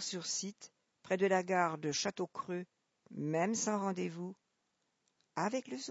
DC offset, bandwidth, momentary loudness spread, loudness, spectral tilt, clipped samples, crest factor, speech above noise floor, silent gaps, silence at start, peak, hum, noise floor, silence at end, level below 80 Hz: under 0.1%; 8 kHz; 15 LU; -36 LUFS; -4 dB/octave; under 0.1%; 20 dB; 46 dB; none; 0 s; -18 dBFS; none; -82 dBFS; 0 s; -84 dBFS